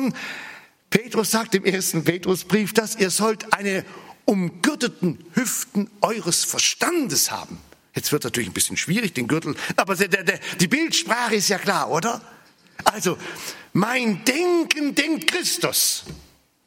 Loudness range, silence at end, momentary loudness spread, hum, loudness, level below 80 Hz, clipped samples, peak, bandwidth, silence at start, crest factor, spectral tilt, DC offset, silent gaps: 2 LU; 0.45 s; 8 LU; none; -21 LUFS; -62 dBFS; under 0.1%; 0 dBFS; 16.5 kHz; 0 s; 22 dB; -3 dB/octave; under 0.1%; none